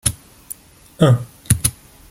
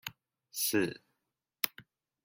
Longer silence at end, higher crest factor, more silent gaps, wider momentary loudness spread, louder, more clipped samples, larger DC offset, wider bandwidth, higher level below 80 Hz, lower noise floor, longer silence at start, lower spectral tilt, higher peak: about the same, 0.4 s vs 0.45 s; second, 20 dB vs 30 dB; neither; first, 19 LU vs 15 LU; first, -18 LUFS vs -34 LUFS; neither; neither; about the same, 17 kHz vs 17 kHz; first, -40 dBFS vs -72 dBFS; second, -39 dBFS vs -86 dBFS; about the same, 0.05 s vs 0.05 s; first, -5 dB/octave vs -2.5 dB/octave; first, 0 dBFS vs -8 dBFS